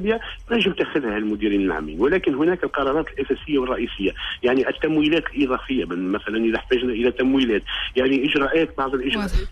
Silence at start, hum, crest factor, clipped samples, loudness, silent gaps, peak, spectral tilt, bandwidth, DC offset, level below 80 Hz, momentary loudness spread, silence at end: 0 s; none; 14 dB; under 0.1%; -22 LUFS; none; -8 dBFS; -6.5 dB/octave; 11.5 kHz; under 0.1%; -36 dBFS; 5 LU; 0 s